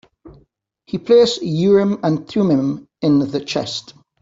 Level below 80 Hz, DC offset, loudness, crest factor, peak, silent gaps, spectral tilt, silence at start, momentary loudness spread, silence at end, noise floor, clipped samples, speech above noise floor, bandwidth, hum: -56 dBFS; under 0.1%; -17 LUFS; 16 dB; -2 dBFS; none; -6.5 dB/octave; 0.25 s; 13 LU; 0.4 s; -58 dBFS; under 0.1%; 42 dB; 7.8 kHz; none